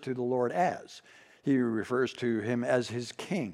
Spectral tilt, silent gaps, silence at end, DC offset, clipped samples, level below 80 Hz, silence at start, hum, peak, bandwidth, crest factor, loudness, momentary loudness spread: -6 dB/octave; none; 0 s; under 0.1%; under 0.1%; -78 dBFS; 0 s; none; -14 dBFS; 12.5 kHz; 16 dB; -31 LUFS; 9 LU